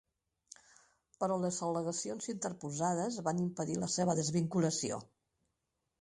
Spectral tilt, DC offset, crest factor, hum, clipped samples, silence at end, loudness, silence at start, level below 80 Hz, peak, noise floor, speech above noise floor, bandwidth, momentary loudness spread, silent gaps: -5 dB/octave; under 0.1%; 18 dB; none; under 0.1%; 0.95 s; -35 LUFS; 1.2 s; -72 dBFS; -18 dBFS; -85 dBFS; 50 dB; 11.5 kHz; 7 LU; none